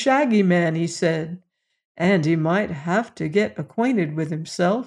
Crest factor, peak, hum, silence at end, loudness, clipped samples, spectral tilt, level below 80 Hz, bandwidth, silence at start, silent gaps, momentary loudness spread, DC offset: 16 dB; -6 dBFS; none; 0 s; -21 LUFS; under 0.1%; -6.5 dB/octave; -62 dBFS; 11 kHz; 0 s; 1.85-1.95 s; 9 LU; under 0.1%